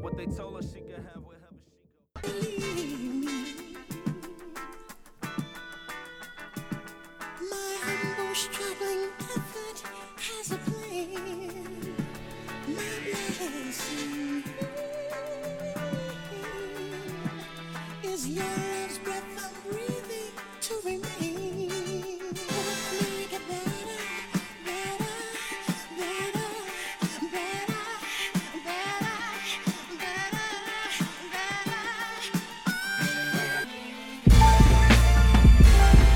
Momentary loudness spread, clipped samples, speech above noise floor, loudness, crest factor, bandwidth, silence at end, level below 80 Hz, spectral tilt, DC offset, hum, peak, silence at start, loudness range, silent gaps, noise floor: 16 LU; under 0.1%; 31 dB; -29 LUFS; 24 dB; 16.5 kHz; 0 s; -30 dBFS; -5 dB/octave; under 0.1%; none; -4 dBFS; 0 s; 10 LU; none; -65 dBFS